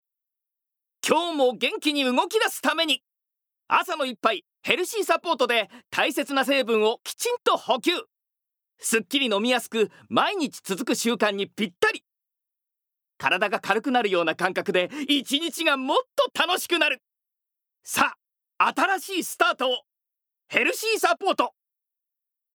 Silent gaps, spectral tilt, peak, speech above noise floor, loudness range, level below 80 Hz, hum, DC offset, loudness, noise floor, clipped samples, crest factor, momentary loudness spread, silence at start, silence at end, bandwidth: none; -2.5 dB/octave; -2 dBFS; 60 dB; 2 LU; -80 dBFS; none; under 0.1%; -24 LUFS; -84 dBFS; under 0.1%; 24 dB; 6 LU; 1.05 s; 1.05 s; over 20 kHz